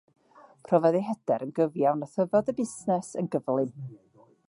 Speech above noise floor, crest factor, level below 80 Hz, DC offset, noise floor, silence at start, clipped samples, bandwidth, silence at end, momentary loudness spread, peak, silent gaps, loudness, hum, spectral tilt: 26 dB; 20 dB; -74 dBFS; under 0.1%; -53 dBFS; 0.7 s; under 0.1%; 11.5 kHz; 0.55 s; 8 LU; -8 dBFS; none; -27 LUFS; none; -7.5 dB/octave